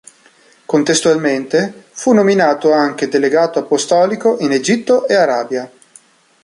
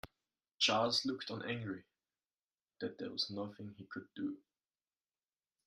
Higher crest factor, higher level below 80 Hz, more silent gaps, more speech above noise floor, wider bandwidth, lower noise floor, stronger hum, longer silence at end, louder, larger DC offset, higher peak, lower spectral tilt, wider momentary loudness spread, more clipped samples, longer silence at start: second, 14 dB vs 24 dB; first, -62 dBFS vs -78 dBFS; second, none vs 2.44-2.49 s; second, 36 dB vs over 51 dB; second, 11.5 kHz vs 13.5 kHz; second, -49 dBFS vs under -90 dBFS; neither; second, 0.75 s vs 1.25 s; first, -14 LUFS vs -38 LUFS; neither; first, -2 dBFS vs -18 dBFS; about the same, -4 dB/octave vs -3.5 dB/octave; second, 7 LU vs 17 LU; neither; first, 0.7 s vs 0.05 s